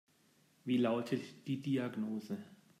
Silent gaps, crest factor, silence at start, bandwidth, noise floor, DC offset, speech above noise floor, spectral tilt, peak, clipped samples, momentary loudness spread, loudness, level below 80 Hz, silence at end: none; 16 dB; 0.65 s; 14.5 kHz; -71 dBFS; under 0.1%; 34 dB; -7 dB/octave; -22 dBFS; under 0.1%; 13 LU; -38 LUFS; -84 dBFS; 0.25 s